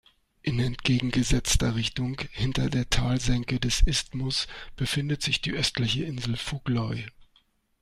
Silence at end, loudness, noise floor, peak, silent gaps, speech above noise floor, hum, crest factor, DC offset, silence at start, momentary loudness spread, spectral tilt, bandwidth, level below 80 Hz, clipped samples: 0.6 s; -27 LUFS; -66 dBFS; -8 dBFS; none; 40 dB; none; 18 dB; under 0.1%; 0.45 s; 7 LU; -4 dB/octave; 15 kHz; -34 dBFS; under 0.1%